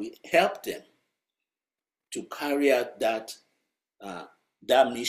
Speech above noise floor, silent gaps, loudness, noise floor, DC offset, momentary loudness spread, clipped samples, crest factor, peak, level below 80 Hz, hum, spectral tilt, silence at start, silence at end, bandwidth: over 63 dB; none; -26 LUFS; under -90 dBFS; under 0.1%; 20 LU; under 0.1%; 22 dB; -8 dBFS; -72 dBFS; none; -3 dB/octave; 0 s; 0 s; 16 kHz